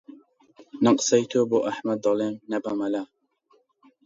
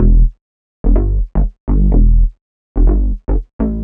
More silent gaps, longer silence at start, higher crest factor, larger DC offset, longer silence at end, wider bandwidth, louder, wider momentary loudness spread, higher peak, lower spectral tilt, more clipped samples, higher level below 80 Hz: second, none vs 0.41-0.84 s, 1.60-1.67 s, 2.41-2.75 s, 3.53-3.59 s; about the same, 0.1 s vs 0 s; first, 18 dB vs 10 dB; neither; first, 1 s vs 0 s; first, 7.8 kHz vs 1.8 kHz; second, -24 LUFS vs -17 LUFS; about the same, 9 LU vs 8 LU; second, -6 dBFS vs 0 dBFS; second, -4.5 dB/octave vs -13.5 dB/octave; neither; second, -72 dBFS vs -12 dBFS